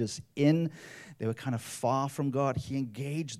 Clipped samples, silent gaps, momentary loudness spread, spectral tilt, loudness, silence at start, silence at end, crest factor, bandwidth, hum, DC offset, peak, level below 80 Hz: under 0.1%; none; 10 LU; -6.5 dB/octave; -31 LUFS; 0 s; 0 s; 18 dB; 15 kHz; none; under 0.1%; -12 dBFS; -66 dBFS